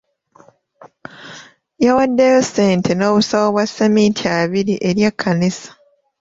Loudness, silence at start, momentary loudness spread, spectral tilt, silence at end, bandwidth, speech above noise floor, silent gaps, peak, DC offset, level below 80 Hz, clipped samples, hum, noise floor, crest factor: -15 LUFS; 1.2 s; 14 LU; -5.5 dB/octave; 0.5 s; 7.8 kHz; 35 dB; none; -2 dBFS; under 0.1%; -54 dBFS; under 0.1%; none; -50 dBFS; 14 dB